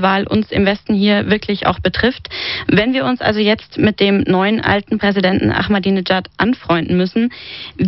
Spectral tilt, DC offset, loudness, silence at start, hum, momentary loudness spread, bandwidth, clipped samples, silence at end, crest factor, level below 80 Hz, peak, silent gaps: -4 dB/octave; 0.1%; -15 LUFS; 0 s; none; 4 LU; 6 kHz; under 0.1%; 0 s; 16 dB; -40 dBFS; 0 dBFS; none